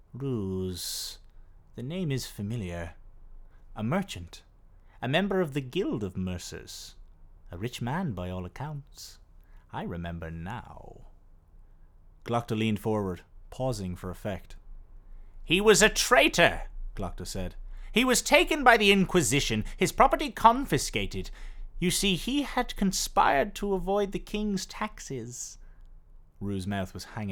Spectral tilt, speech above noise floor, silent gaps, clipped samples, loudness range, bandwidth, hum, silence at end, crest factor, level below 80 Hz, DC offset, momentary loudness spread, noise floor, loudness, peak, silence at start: -4 dB/octave; 27 dB; none; under 0.1%; 14 LU; over 20 kHz; none; 0 s; 26 dB; -44 dBFS; under 0.1%; 20 LU; -54 dBFS; -27 LUFS; -4 dBFS; 0.15 s